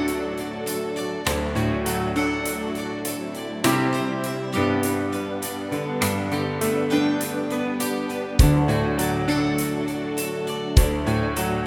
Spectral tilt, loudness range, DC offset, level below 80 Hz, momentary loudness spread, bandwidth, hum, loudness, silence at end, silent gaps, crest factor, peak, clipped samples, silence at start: -5.5 dB/octave; 3 LU; under 0.1%; -30 dBFS; 8 LU; 19 kHz; none; -24 LUFS; 0 s; none; 22 dB; -2 dBFS; under 0.1%; 0 s